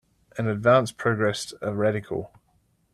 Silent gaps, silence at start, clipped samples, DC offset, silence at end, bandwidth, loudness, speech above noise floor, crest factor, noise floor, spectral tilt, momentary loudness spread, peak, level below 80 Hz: none; 0.35 s; under 0.1%; under 0.1%; 0.65 s; 13.5 kHz; -25 LUFS; 43 dB; 20 dB; -66 dBFS; -6 dB/octave; 14 LU; -6 dBFS; -60 dBFS